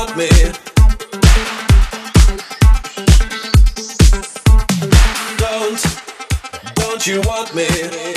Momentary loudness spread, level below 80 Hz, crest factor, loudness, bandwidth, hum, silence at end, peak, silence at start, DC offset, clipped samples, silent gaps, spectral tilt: 7 LU; -14 dBFS; 12 dB; -14 LUFS; 15 kHz; none; 0 s; 0 dBFS; 0 s; under 0.1%; under 0.1%; none; -4.5 dB/octave